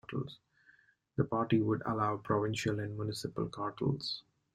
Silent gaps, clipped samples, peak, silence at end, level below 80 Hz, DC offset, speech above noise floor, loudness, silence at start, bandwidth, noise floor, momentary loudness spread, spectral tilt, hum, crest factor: none; under 0.1%; -16 dBFS; 0.35 s; -66 dBFS; under 0.1%; 33 dB; -35 LUFS; 0.1 s; 13.5 kHz; -67 dBFS; 10 LU; -6.5 dB/octave; none; 20 dB